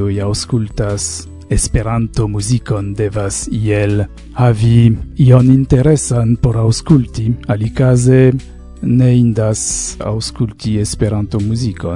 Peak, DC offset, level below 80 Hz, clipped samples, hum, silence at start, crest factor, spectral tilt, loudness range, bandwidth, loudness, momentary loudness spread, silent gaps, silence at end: 0 dBFS; under 0.1%; -28 dBFS; 0.2%; none; 0 s; 12 dB; -6.5 dB/octave; 5 LU; 11 kHz; -14 LUFS; 10 LU; none; 0 s